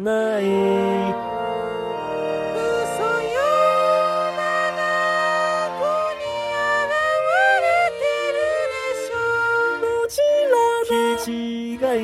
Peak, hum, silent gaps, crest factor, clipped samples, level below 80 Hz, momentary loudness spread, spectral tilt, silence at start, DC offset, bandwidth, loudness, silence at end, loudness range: -6 dBFS; none; none; 14 dB; under 0.1%; -56 dBFS; 8 LU; -4 dB/octave; 0 s; under 0.1%; 16 kHz; -20 LUFS; 0 s; 2 LU